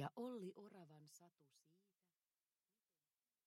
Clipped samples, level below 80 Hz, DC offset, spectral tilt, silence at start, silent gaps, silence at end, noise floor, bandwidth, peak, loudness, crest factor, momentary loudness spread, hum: under 0.1%; under -90 dBFS; under 0.1%; -6.5 dB/octave; 0 s; none; 1.7 s; under -90 dBFS; 16 kHz; -34 dBFS; -55 LUFS; 24 dB; 16 LU; none